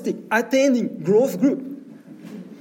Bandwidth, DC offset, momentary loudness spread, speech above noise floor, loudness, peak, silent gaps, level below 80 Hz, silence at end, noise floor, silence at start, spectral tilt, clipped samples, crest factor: 17 kHz; under 0.1%; 21 LU; 21 dB; -20 LUFS; -6 dBFS; none; -78 dBFS; 0.05 s; -41 dBFS; 0 s; -5.5 dB/octave; under 0.1%; 16 dB